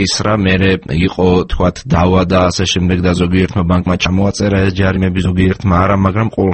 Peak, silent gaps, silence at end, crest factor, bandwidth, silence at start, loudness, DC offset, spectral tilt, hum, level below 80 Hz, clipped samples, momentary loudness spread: 0 dBFS; none; 0 s; 12 dB; 8.8 kHz; 0 s; -13 LUFS; under 0.1%; -6 dB/octave; none; -28 dBFS; under 0.1%; 3 LU